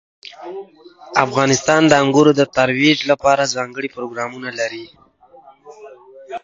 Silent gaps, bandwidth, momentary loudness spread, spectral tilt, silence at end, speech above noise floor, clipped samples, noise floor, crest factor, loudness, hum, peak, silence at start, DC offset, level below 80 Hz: none; 7.8 kHz; 20 LU; -4 dB/octave; 0.05 s; 30 dB; under 0.1%; -46 dBFS; 18 dB; -16 LUFS; none; 0 dBFS; 0.4 s; under 0.1%; -58 dBFS